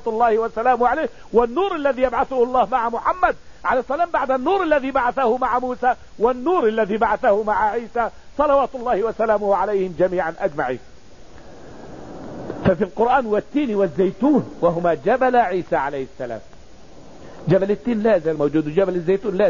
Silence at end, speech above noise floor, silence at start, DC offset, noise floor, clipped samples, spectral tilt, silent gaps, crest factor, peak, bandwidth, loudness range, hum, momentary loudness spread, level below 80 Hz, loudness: 0 s; 25 dB; 0.05 s; 0.9%; -44 dBFS; under 0.1%; -7.5 dB/octave; none; 18 dB; -2 dBFS; 7.4 kHz; 4 LU; none; 8 LU; -46 dBFS; -20 LUFS